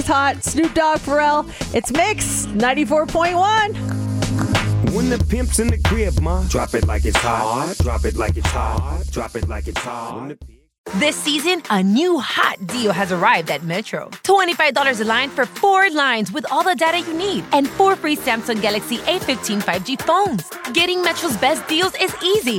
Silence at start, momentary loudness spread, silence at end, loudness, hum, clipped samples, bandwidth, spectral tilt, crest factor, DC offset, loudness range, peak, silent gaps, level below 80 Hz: 0 s; 8 LU; 0 s; -18 LUFS; none; under 0.1%; 17 kHz; -4 dB/octave; 16 dB; under 0.1%; 4 LU; -2 dBFS; 10.78-10.84 s; -30 dBFS